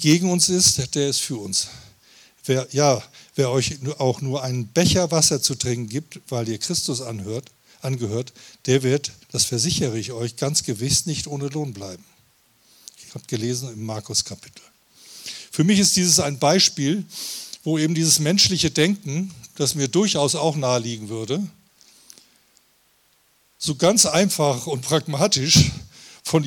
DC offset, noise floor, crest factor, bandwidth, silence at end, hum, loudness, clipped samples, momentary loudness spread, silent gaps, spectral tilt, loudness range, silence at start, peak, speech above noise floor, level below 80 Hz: under 0.1%; -61 dBFS; 18 dB; 19 kHz; 0 s; none; -20 LUFS; under 0.1%; 16 LU; none; -3.5 dB/octave; 8 LU; 0 s; -4 dBFS; 40 dB; -50 dBFS